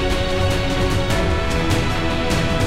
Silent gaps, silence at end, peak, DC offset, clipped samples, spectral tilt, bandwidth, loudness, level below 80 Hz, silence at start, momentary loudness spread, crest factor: none; 0 s; -6 dBFS; under 0.1%; under 0.1%; -5 dB/octave; 16 kHz; -20 LUFS; -24 dBFS; 0 s; 1 LU; 14 dB